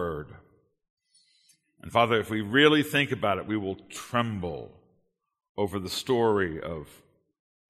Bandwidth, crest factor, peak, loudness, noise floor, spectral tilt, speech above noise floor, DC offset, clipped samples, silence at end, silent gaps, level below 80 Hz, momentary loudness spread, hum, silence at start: 13.5 kHz; 22 dB; -6 dBFS; -26 LUFS; -72 dBFS; -5 dB/octave; 46 dB; under 0.1%; under 0.1%; 0.85 s; 0.90-0.97 s, 5.49-5.55 s; -58 dBFS; 18 LU; none; 0 s